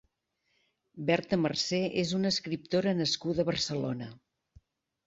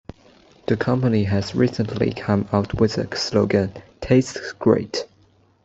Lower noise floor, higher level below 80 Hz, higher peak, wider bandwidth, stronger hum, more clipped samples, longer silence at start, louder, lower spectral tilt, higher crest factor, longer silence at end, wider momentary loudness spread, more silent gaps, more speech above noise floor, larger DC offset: first, -78 dBFS vs -57 dBFS; second, -62 dBFS vs -48 dBFS; second, -12 dBFS vs -2 dBFS; about the same, 8 kHz vs 8 kHz; neither; neither; first, 0.95 s vs 0.7 s; second, -30 LUFS vs -21 LUFS; second, -5 dB/octave vs -6.5 dB/octave; about the same, 20 dB vs 18 dB; first, 0.9 s vs 0.6 s; second, 7 LU vs 10 LU; neither; first, 48 dB vs 37 dB; neither